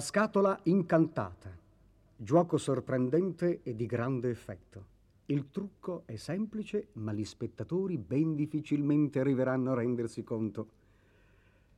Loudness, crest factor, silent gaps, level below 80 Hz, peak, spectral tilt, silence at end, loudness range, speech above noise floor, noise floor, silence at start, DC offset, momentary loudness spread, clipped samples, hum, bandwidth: -32 LUFS; 20 dB; none; -66 dBFS; -14 dBFS; -7.5 dB/octave; 1.1 s; 6 LU; 32 dB; -64 dBFS; 0 s; under 0.1%; 13 LU; under 0.1%; none; 12.5 kHz